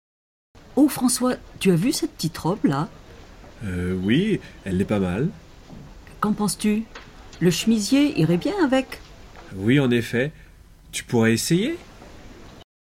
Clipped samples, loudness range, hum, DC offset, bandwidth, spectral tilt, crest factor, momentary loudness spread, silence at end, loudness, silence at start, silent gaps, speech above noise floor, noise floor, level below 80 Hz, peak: under 0.1%; 4 LU; none; under 0.1%; 17 kHz; -5.5 dB/octave; 18 dB; 13 LU; 0.2 s; -22 LUFS; 0.75 s; none; 26 dB; -47 dBFS; -48 dBFS; -6 dBFS